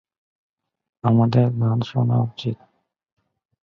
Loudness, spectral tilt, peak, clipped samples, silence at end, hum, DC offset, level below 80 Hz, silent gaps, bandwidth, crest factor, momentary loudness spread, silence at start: -21 LUFS; -9.5 dB/octave; -4 dBFS; under 0.1%; 1.1 s; none; under 0.1%; -58 dBFS; none; 6.2 kHz; 18 dB; 12 LU; 1.05 s